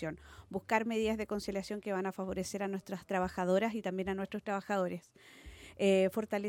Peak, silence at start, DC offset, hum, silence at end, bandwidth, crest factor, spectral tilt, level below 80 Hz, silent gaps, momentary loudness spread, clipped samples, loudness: -14 dBFS; 0 s; under 0.1%; none; 0 s; 17 kHz; 20 dB; -5.5 dB/octave; -60 dBFS; none; 14 LU; under 0.1%; -35 LUFS